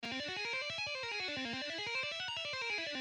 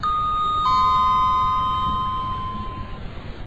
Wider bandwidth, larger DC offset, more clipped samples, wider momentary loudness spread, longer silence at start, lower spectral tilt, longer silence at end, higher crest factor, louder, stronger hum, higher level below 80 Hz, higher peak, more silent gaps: first, 12 kHz vs 7.8 kHz; neither; neither; second, 2 LU vs 17 LU; about the same, 0 s vs 0 s; second, -2 dB/octave vs -5.5 dB/octave; about the same, 0 s vs 0 s; about the same, 12 dB vs 12 dB; second, -38 LUFS vs -20 LUFS; neither; second, -74 dBFS vs -36 dBFS; second, -28 dBFS vs -10 dBFS; neither